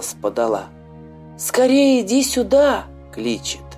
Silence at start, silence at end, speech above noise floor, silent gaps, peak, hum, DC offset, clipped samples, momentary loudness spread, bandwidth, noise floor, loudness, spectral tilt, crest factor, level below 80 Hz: 0 s; 0 s; 23 dB; none; -4 dBFS; none; under 0.1%; under 0.1%; 12 LU; 15.5 kHz; -40 dBFS; -18 LUFS; -3.5 dB/octave; 14 dB; -44 dBFS